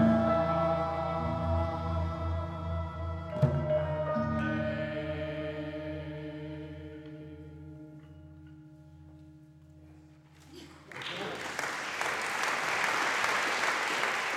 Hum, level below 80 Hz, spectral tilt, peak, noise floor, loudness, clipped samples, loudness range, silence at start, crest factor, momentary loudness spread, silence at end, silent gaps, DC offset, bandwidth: none; -48 dBFS; -5 dB/octave; -12 dBFS; -56 dBFS; -32 LUFS; under 0.1%; 19 LU; 0 s; 20 dB; 22 LU; 0 s; none; under 0.1%; 15.5 kHz